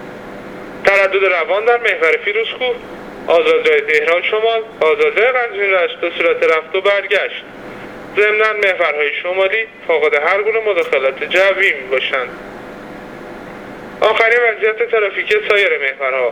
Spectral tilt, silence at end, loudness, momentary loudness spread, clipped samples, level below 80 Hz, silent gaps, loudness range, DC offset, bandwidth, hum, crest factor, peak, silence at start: -3.5 dB/octave; 0 s; -14 LUFS; 19 LU; under 0.1%; -54 dBFS; none; 3 LU; under 0.1%; 12 kHz; none; 16 dB; 0 dBFS; 0 s